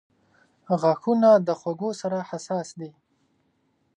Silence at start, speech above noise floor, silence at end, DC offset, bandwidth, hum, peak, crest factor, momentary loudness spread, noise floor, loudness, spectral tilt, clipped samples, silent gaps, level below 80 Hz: 0.7 s; 46 dB; 1.1 s; under 0.1%; 10 kHz; none; -8 dBFS; 18 dB; 17 LU; -69 dBFS; -23 LUFS; -6.5 dB/octave; under 0.1%; none; -76 dBFS